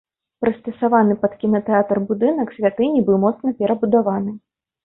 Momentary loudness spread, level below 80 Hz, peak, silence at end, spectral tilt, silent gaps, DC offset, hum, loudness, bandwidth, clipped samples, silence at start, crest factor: 7 LU; -58 dBFS; -2 dBFS; 0.45 s; -12.5 dB/octave; none; under 0.1%; none; -19 LUFS; 3.9 kHz; under 0.1%; 0.4 s; 16 dB